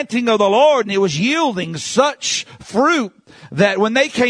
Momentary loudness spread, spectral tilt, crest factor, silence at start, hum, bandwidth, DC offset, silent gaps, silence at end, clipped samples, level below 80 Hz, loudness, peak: 9 LU; -4 dB/octave; 16 dB; 0 s; none; 10.5 kHz; under 0.1%; none; 0 s; under 0.1%; -58 dBFS; -16 LUFS; 0 dBFS